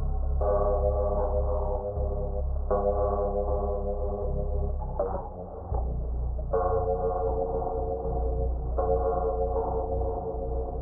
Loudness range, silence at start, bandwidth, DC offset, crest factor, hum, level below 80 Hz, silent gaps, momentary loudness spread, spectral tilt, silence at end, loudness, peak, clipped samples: 3 LU; 0 s; 1.7 kHz; under 0.1%; 14 dB; none; -30 dBFS; none; 6 LU; -8 dB/octave; 0 s; -30 LUFS; -14 dBFS; under 0.1%